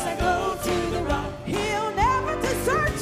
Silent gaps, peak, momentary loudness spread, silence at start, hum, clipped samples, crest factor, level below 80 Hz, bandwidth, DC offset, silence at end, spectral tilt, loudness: none; -10 dBFS; 5 LU; 0 s; none; under 0.1%; 14 dB; -36 dBFS; 16 kHz; under 0.1%; 0 s; -4.5 dB/octave; -25 LUFS